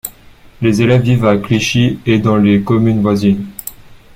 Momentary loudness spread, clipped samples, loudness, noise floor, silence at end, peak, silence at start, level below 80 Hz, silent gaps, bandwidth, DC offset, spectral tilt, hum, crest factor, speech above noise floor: 12 LU; under 0.1%; -13 LUFS; -40 dBFS; 0.2 s; 0 dBFS; 0.05 s; -40 dBFS; none; 16.5 kHz; under 0.1%; -6.5 dB/octave; none; 12 dB; 29 dB